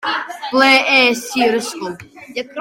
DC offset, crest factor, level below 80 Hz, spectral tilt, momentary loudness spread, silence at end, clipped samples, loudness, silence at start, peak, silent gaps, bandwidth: under 0.1%; 16 dB; -62 dBFS; -2 dB/octave; 18 LU; 0 s; under 0.1%; -14 LUFS; 0 s; 0 dBFS; none; 17 kHz